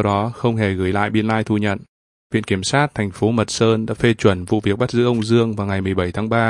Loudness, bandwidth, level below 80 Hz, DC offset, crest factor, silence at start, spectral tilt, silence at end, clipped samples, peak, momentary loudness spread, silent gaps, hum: -19 LUFS; 11.5 kHz; -50 dBFS; under 0.1%; 18 dB; 0 s; -6 dB/octave; 0 s; under 0.1%; 0 dBFS; 4 LU; 1.89-2.30 s; none